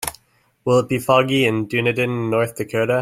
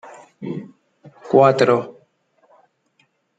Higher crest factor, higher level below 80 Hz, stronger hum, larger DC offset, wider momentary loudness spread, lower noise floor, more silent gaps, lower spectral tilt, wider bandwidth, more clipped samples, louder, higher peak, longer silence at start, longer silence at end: about the same, 18 dB vs 20 dB; first, -56 dBFS vs -68 dBFS; neither; neither; second, 6 LU vs 21 LU; second, -60 dBFS vs -64 dBFS; neither; about the same, -5.5 dB/octave vs -6.5 dB/octave; first, 16.5 kHz vs 9.2 kHz; neither; about the same, -19 LUFS vs -17 LUFS; about the same, -2 dBFS vs -2 dBFS; second, 0 s vs 0.4 s; second, 0 s vs 1.45 s